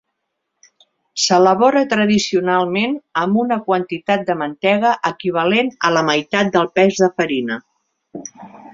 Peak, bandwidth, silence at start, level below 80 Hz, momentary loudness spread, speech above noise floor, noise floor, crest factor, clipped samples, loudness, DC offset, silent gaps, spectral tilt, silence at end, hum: 0 dBFS; 7.8 kHz; 1.15 s; -60 dBFS; 11 LU; 58 dB; -75 dBFS; 16 dB; under 0.1%; -16 LUFS; under 0.1%; none; -4.5 dB/octave; 0.05 s; none